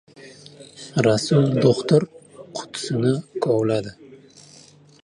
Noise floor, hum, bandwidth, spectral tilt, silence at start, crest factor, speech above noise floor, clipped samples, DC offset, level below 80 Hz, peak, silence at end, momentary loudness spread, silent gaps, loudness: -49 dBFS; none; 11 kHz; -6.5 dB/octave; 0.2 s; 18 dB; 30 dB; under 0.1%; under 0.1%; -60 dBFS; -4 dBFS; 0.9 s; 17 LU; none; -21 LUFS